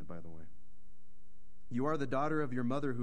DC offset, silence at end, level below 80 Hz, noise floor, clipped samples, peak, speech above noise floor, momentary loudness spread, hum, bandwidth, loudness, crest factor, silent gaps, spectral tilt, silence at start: 2%; 0 s; -66 dBFS; -65 dBFS; under 0.1%; -20 dBFS; 30 dB; 18 LU; none; 10.5 kHz; -36 LUFS; 16 dB; none; -8 dB/octave; 0 s